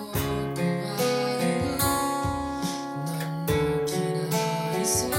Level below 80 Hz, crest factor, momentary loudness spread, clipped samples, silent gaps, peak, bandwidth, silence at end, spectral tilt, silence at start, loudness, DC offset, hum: -46 dBFS; 16 dB; 6 LU; under 0.1%; none; -12 dBFS; 16.5 kHz; 0 s; -4.5 dB/octave; 0 s; -27 LUFS; under 0.1%; none